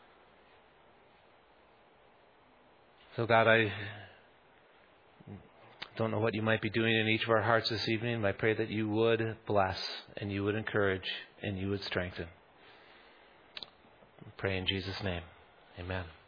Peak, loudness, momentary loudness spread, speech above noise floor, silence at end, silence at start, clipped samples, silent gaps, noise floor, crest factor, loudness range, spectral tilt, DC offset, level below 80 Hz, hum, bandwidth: -10 dBFS; -32 LUFS; 19 LU; 31 dB; 0.15 s; 3.1 s; under 0.1%; none; -63 dBFS; 24 dB; 9 LU; -7 dB/octave; under 0.1%; -66 dBFS; none; 5.2 kHz